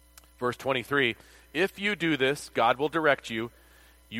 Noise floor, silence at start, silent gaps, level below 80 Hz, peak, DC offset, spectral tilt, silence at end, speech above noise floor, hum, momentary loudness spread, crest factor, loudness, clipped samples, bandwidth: -56 dBFS; 0.4 s; none; -60 dBFS; -8 dBFS; under 0.1%; -4.5 dB/octave; 0 s; 28 dB; none; 10 LU; 22 dB; -27 LUFS; under 0.1%; 16.5 kHz